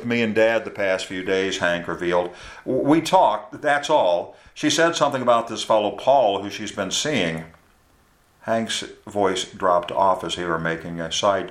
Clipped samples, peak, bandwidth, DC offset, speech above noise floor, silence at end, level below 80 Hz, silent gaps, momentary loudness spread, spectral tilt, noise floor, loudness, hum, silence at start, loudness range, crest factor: under 0.1%; -4 dBFS; 15 kHz; under 0.1%; 37 dB; 0 s; -56 dBFS; none; 9 LU; -3.5 dB/octave; -58 dBFS; -21 LUFS; none; 0 s; 4 LU; 18 dB